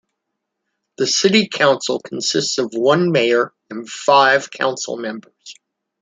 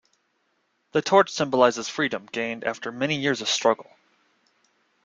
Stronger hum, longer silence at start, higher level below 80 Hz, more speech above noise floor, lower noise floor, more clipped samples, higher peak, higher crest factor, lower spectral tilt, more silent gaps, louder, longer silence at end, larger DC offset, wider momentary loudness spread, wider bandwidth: neither; about the same, 1 s vs 0.95 s; about the same, -66 dBFS vs -68 dBFS; first, 60 dB vs 48 dB; first, -77 dBFS vs -71 dBFS; neither; about the same, -2 dBFS vs -4 dBFS; about the same, 18 dB vs 22 dB; about the same, -3.5 dB/octave vs -3.5 dB/octave; neither; first, -17 LUFS vs -24 LUFS; second, 0.5 s vs 1.2 s; neither; first, 13 LU vs 10 LU; about the same, 9.6 kHz vs 9.4 kHz